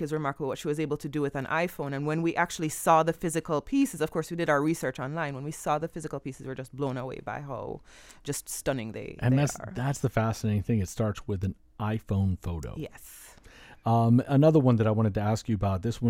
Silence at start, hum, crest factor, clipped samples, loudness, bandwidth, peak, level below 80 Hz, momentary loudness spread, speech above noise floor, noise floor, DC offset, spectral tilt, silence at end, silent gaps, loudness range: 0 s; none; 20 dB; under 0.1%; -28 LUFS; 17 kHz; -8 dBFS; -52 dBFS; 14 LU; 24 dB; -52 dBFS; under 0.1%; -6.5 dB/octave; 0 s; none; 8 LU